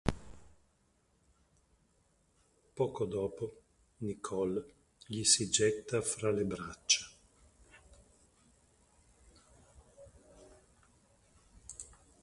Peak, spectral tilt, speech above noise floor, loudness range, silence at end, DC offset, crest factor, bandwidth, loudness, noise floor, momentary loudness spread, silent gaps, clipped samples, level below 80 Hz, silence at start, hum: -12 dBFS; -3 dB/octave; 39 dB; 10 LU; 0.35 s; under 0.1%; 26 dB; 11.5 kHz; -33 LUFS; -73 dBFS; 24 LU; none; under 0.1%; -60 dBFS; 0.05 s; none